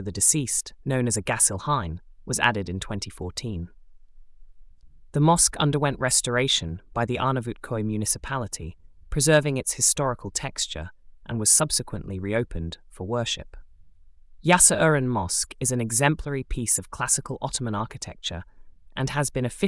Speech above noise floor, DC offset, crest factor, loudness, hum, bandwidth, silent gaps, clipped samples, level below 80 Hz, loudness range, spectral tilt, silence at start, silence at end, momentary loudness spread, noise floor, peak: 24 dB; under 0.1%; 22 dB; -23 LUFS; none; 12 kHz; none; under 0.1%; -44 dBFS; 5 LU; -3.5 dB/octave; 0 s; 0 s; 15 LU; -49 dBFS; -4 dBFS